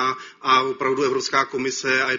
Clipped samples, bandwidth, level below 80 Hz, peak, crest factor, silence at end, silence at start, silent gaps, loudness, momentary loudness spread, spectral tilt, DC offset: under 0.1%; 7.6 kHz; -66 dBFS; -4 dBFS; 16 dB; 0 s; 0 s; none; -21 LUFS; 6 LU; -1 dB/octave; under 0.1%